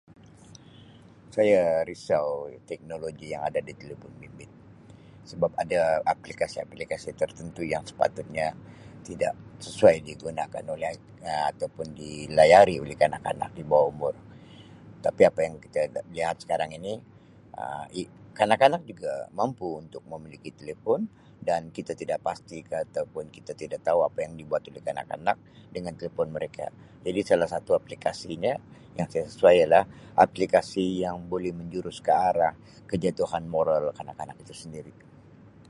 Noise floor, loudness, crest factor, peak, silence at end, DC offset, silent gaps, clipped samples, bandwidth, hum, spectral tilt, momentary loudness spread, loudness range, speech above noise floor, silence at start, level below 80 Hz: -52 dBFS; -27 LUFS; 24 dB; -4 dBFS; 0.8 s; under 0.1%; none; under 0.1%; 11.5 kHz; none; -5.5 dB/octave; 19 LU; 9 LU; 25 dB; 1.35 s; -58 dBFS